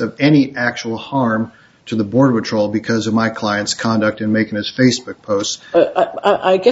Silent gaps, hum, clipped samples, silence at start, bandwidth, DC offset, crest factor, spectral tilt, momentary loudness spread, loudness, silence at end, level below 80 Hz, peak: none; none; under 0.1%; 0 s; 8 kHz; under 0.1%; 16 dB; -5 dB/octave; 8 LU; -16 LUFS; 0 s; -56 dBFS; 0 dBFS